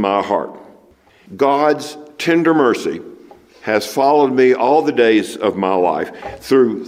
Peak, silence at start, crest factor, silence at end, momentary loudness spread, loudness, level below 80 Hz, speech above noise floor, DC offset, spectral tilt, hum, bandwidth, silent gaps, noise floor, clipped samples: -2 dBFS; 0 s; 14 dB; 0 s; 13 LU; -15 LUFS; -58 dBFS; 35 dB; under 0.1%; -5.5 dB/octave; none; 15.5 kHz; none; -50 dBFS; under 0.1%